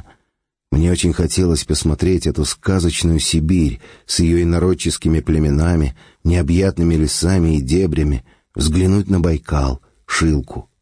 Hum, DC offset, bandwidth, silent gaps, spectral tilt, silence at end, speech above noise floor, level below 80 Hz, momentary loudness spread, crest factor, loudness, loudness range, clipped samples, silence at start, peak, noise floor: none; 0.2%; 10.5 kHz; none; -5.5 dB/octave; 0.2 s; 56 dB; -26 dBFS; 6 LU; 12 dB; -17 LUFS; 1 LU; under 0.1%; 0.7 s; -4 dBFS; -72 dBFS